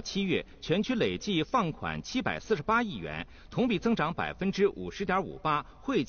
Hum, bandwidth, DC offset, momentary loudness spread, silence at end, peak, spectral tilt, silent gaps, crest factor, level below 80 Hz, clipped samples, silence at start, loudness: none; 6.8 kHz; under 0.1%; 7 LU; 0 s; -14 dBFS; -4 dB/octave; none; 16 dB; -52 dBFS; under 0.1%; 0 s; -30 LUFS